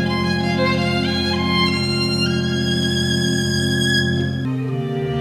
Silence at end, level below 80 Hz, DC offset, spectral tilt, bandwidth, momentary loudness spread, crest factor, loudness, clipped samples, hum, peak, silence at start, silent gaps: 0 s; -42 dBFS; under 0.1%; -5 dB/octave; 14.5 kHz; 6 LU; 14 dB; -19 LUFS; under 0.1%; none; -6 dBFS; 0 s; none